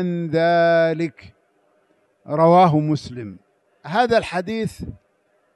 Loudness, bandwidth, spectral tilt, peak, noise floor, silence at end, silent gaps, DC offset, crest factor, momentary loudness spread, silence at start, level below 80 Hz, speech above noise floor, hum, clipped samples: -19 LUFS; 12 kHz; -7 dB/octave; -4 dBFS; -64 dBFS; 0.65 s; none; under 0.1%; 16 dB; 20 LU; 0 s; -52 dBFS; 45 dB; none; under 0.1%